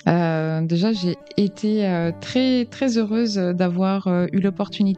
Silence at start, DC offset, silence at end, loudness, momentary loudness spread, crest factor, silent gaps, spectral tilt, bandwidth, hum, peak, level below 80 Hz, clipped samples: 0.05 s; under 0.1%; 0 s; -21 LUFS; 3 LU; 18 dB; none; -7 dB/octave; 8.2 kHz; none; -2 dBFS; -64 dBFS; under 0.1%